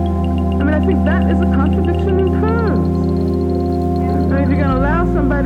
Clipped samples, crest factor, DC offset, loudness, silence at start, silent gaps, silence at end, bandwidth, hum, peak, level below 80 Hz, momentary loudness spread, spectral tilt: under 0.1%; 10 dB; under 0.1%; -16 LUFS; 0 s; none; 0 s; 4.9 kHz; none; -4 dBFS; -22 dBFS; 3 LU; -9.5 dB/octave